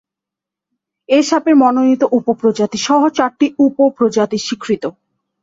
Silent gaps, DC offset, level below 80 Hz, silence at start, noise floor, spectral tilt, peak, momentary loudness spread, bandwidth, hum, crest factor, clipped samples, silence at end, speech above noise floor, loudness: none; under 0.1%; -60 dBFS; 1.1 s; -85 dBFS; -4.5 dB/octave; -2 dBFS; 8 LU; 7.8 kHz; none; 14 dB; under 0.1%; 0.5 s; 71 dB; -14 LUFS